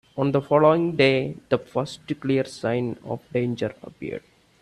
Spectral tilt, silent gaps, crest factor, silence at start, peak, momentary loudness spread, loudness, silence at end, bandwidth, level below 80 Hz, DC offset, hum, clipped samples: -7 dB/octave; none; 20 dB; 0.15 s; -4 dBFS; 16 LU; -23 LUFS; 0.4 s; 12 kHz; -60 dBFS; under 0.1%; none; under 0.1%